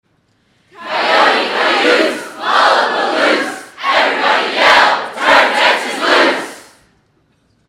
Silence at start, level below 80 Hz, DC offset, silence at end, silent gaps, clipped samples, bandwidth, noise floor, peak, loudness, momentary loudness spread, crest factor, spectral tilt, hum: 0.8 s; -58 dBFS; under 0.1%; 1.1 s; none; under 0.1%; 16 kHz; -58 dBFS; 0 dBFS; -12 LUFS; 12 LU; 14 dB; -1.5 dB/octave; none